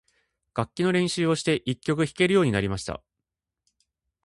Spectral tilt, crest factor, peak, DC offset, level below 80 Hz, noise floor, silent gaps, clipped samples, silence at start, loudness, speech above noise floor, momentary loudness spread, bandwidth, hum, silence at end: -5.5 dB/octave; 20 dB; -8 dBFS; under 0.1%; -52 dBFS; -86 dBFS; none; under 0.1%; 0.55 s; -25 LUFS; 62 dB; 12 LU; 11.5 kHz; none; 1.25 s